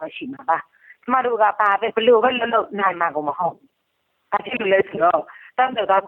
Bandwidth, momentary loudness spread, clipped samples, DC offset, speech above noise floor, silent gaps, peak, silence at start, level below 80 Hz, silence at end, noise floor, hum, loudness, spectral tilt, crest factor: 4 kHz; 10 LU; under 0.1%; under 0.1%; 52 dB; none; -4 dBFS; 0 s; -66 dBFS; 0 s; -71 dBFS; none; -20 LUFS; -7 dB/octave; 16 dB